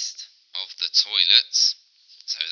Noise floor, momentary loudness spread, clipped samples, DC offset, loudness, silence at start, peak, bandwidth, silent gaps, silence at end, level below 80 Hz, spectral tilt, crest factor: -44 dBFS; 22 LU; under 0.1%; under 0.1%; -18 LUFS; 0 s; -2 dBFS; 7.6 kHz; none; 0 s; -82 dBFS; 5.5 dB/octave; 22 dB